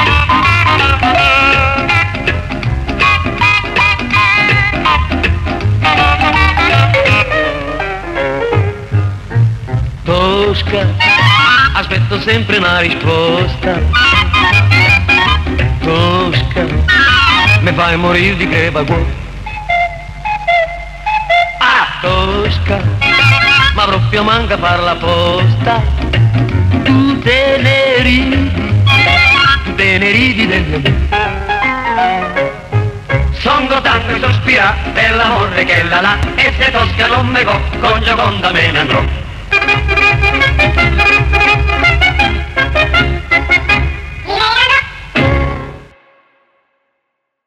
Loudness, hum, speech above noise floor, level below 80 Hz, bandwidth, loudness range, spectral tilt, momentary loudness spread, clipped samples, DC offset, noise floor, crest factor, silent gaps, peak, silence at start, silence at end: -10 LUFS; none; 59 dB; -22 dBFS; 11 kHz; 4 LU; -5.5 dB/octave; 8 LU; under 0.1%; 0.1%; -70 dBFS; 12 dB; none; 0 dBFS; 0 s; 1.65 s